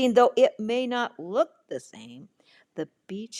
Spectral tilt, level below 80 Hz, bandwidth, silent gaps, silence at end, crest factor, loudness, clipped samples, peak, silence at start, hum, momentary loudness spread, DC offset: -4.5 dB/octave; -78 dBFS; 10.5 kHz; none; 0 s; 20 dB; -25 LUFS; under 0.1%; -6 dBFS; 0 s; none; 23 LU; under 0.1%